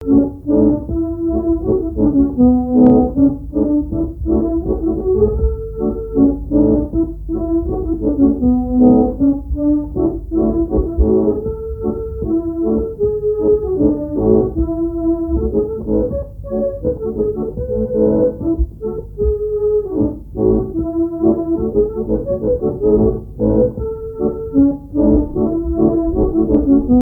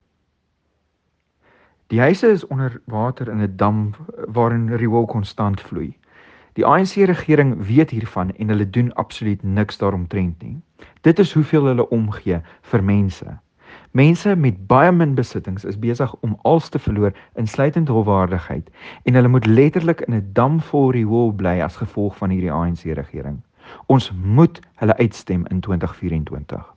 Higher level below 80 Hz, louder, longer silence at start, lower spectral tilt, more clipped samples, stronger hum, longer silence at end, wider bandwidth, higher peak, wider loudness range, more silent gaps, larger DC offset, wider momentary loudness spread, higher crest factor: first, -26 dBFS vs -46 dBFS; about the same, -16 LUFS vs -18 LUFS; second, 0 s vs 1.9 s; first, -13.5 dB/octave vs -8.5 dB/octave; neither; neither; second, 0 s vs 0.15 s; second, 1.8 kHz vs 8 kHz; about the same, 0 dBFS vs 0 dBFS; about the same, 4 LU vs 4 LU; neither; neither; second, 8 LU vs 12 LU; about the same, 16 dB vs 18 dB